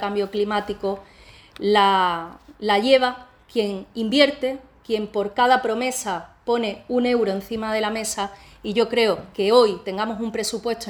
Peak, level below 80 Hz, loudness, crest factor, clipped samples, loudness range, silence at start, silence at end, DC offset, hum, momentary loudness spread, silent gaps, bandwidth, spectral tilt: -2 dBFS; -54 dBFS; -22 LUFS; 20 dB; under 0.1%; 3 LU; 0 s; 0 s; under 0.1%; none; 12 LU; none; over 20 kHz; -3.5 dB/octave